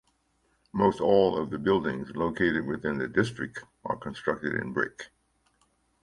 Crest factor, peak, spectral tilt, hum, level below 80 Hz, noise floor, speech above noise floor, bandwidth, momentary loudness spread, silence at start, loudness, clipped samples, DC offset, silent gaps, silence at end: 20 dB; -8 dBFS; -6.5 dB/octave; none; -56 dBFS; -71 dBFS; 43 dB; 11.5 kHz; 14 LU; 0.75 s; -28 LUFS; under 0.1%; under 0.1%; none; 0.95 s